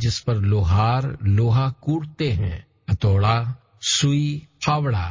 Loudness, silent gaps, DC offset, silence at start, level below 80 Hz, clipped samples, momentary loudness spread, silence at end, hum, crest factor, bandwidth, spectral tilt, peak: -21 LUFS; none; under 0.1%; 0 s; -34 dBFS; under 0.1%; 8 LU; 0 s; none; 14 dB; 7.6 kHz; -5.5 dB/octave; -8 dBFS